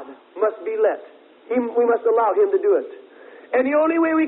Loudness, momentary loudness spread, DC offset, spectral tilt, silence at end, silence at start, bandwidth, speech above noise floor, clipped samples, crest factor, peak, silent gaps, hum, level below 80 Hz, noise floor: -20 LUFS; 7 LU; under 0.1%; -9.5 dB/octave; 0 s; 0 s; 4 kHz; 25 dB; under 0.1%; 14 dB; -6 dBFS; none; none; -72 dBFS; -44 dBFS